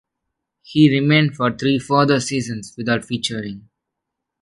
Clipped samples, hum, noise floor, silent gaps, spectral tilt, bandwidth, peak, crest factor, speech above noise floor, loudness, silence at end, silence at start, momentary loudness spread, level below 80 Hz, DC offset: under 0.1%; none; -81 dBFS; none; -5.5 dB/octave; 11.5 kHz; -2 dBFS; 18 dB; 63 dB; -18 LUFS; 0.8 s; 0.7 s; 14 LU; -56 dBFS; under 0.1%